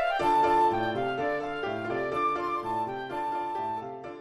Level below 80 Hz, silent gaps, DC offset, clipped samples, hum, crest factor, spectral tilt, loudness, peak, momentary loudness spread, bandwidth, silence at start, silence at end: -56 dBFS; none; under 0.1%; under 0.1%; none; 14 dB; -6 dB/octave; -29 LUFS; -14 dBFS; 10 LU; 13 kHz; 0 s; 0 s